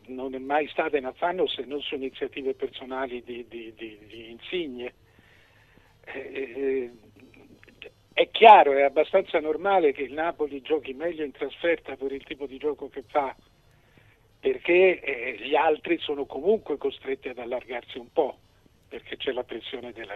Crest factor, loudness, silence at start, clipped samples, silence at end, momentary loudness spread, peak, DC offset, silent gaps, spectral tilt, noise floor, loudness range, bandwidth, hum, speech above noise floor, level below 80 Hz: 24 dB; -25 LUFS; 0.1 s; under 0.1%; 0 s; 17 LU; -2 dBFS; under 0.1%; none; -6 dB/octave; -59 dBFS; 15 LU; 6.2 kHz; none; 33 dB; -62 dBFS